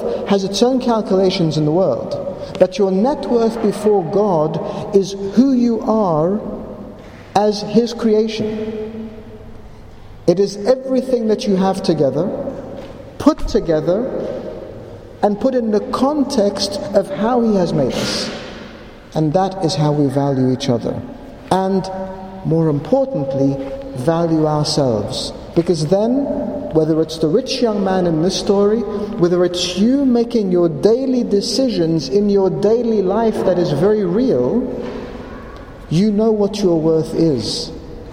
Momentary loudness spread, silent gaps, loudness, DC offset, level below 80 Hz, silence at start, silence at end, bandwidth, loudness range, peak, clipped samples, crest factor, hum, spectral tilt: 13 LU; none; -17 LUFS; under 0.1%; -40 dBFS; 0 s; 0 s; 15.5 kHz; 4 LU; 0 dBFS; under 0.1%; 16 dB; none; -6.5 dB/octave